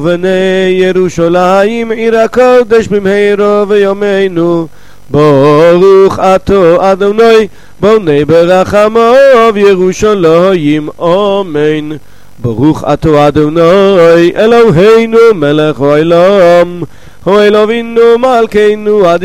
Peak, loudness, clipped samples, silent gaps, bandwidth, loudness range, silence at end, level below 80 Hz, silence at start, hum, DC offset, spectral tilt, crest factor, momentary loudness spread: 0 dBFS; -6 LUFS; 10%; none; 13 kHz; 3 LU; 0 s; -36 dBFS; 0 s; none; 3%; -6.5 dB/octave; 6 dB; 7 LU